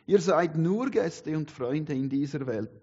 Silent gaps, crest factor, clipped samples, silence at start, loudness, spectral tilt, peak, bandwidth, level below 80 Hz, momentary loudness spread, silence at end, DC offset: none; 18 dB; under 0.1%; 0.1 s; -28 LUFS; -7 dB/octave; -10 dBFS; 8 kHz; -68 dBFS; 9 LU; 0.05 s; under 0.1%